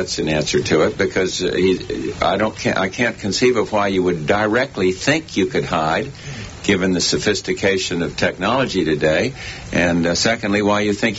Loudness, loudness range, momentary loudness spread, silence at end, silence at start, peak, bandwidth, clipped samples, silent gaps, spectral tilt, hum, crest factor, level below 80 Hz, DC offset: -18 LUFS; 1 LU; 4 LU; 0 s; 0 s; -4 dBFS; 8 kHz; under 0.1%; none; -4.5 dB/octave; none; 16 dB; -42 dBFS; under 0.1%